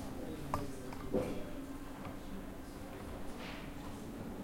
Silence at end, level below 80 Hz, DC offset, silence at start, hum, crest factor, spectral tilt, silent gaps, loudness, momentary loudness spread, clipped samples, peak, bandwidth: 0 s; -52 dBFS; under 0.1%; 0 s; none; 22 dB; -6 dB/octave; none; -44 LUFS; 9 LU; under 0.1%; -20 dBFS; 16.5 kHz